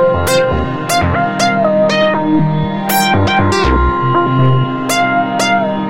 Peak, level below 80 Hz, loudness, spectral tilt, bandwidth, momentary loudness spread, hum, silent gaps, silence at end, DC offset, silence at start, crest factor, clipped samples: 0 dBFS; -26 dBFS; -13 LUFS; -5.5 dB/octave; 16.5 kHz; 3 LU; none; none; 0 s; under 0.1%; 0 s; 12 dB; under 0.1%